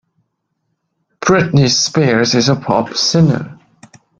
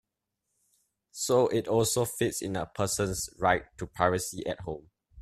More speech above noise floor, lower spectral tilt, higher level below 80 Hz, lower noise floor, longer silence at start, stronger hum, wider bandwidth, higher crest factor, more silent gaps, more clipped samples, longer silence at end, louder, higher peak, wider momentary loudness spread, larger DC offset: about the same, 57 dB vs 55 dB; about the same, -4.5 dB/octave vs -4 dB/octave; first, -48 dBFS vs -56 dBFS; second, -70 dBFS vs -84 dBFS; about the same, 1.2 s vs 1.15 s; neither; second, 7.8 kHz vs 15.5 kHz; second, 16 dB vs 22 dB; neither; neither; first, 0.65 s vs 0 s; first, -13 LUFS vs -29 LUFS; first, 0 dBFS vs -8 dBFS; second, 7 LU vs 12 LU; neither